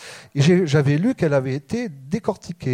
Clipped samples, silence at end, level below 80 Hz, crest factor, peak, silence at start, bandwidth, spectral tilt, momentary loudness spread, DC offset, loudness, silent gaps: under 0.1%; 0 s; -54 dBFS; 16 dB; -6 dBFS; 0 s; 10.5 kHz; -7 dB/octave; 11 LU; under 0.1%; -21 LUFS; none